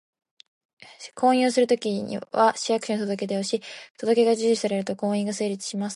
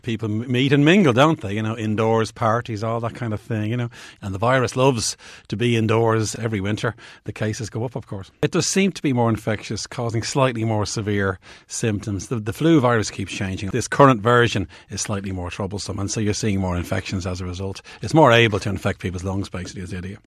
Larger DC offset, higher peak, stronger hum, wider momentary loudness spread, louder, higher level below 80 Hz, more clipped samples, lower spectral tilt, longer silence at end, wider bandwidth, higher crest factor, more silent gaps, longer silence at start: neither; second, -8 dBFS vs 0 dBFS; neither; second, 10 LU vs 14 LU; second, -24 LUFS vs -21 LUFS; second, -74 dBFS vs -50 dBFS; neither; about the same, -4.5 dB/octave vs -5.5 dB/octave; about the same, 0 s vs 0.1 s; second, 11.5 kHz vs 14 kHz; about the same, 16 dB vs 20 dB; first, 3.90-3.95 s vs none; first, 0.8 s vs 0.05 s